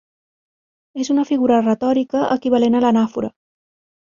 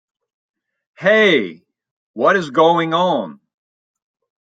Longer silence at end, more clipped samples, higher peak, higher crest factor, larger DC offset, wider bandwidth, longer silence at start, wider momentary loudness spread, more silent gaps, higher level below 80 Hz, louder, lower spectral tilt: second, 0.75 s vs 1.25 s; neither; about the same, -4 dBFS vs -2 dBFS; about the same, 16 dB vs 18 dB; neither; about the same, 7.4 kHz vs 7.8 kHz; about the same, 0.95 s vs 1 s; about the same, 12 LU vs 10 LU; second, none vs 1.91-2.14 s; first, -60 dBFS vs -70 dBFS; about the same, -17 LUFS vs -15 LUFS; about the same, -6 dB/octave vs -5.5 dB/octave